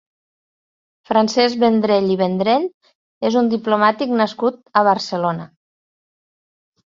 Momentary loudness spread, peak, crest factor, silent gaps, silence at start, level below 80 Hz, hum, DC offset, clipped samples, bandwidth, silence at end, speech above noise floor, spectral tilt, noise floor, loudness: 7 LU; -2 dBFS; 18 dB; 2.74-2.81 s, 2.95-3.21 s; 1.1 s; -64 dBFS; none; under 0.1%; under 0.1%; 7.6 kHz; 1.4 s; over 73 dB; -5.5 dB/octave; under -90 dBFS; -17 LUFS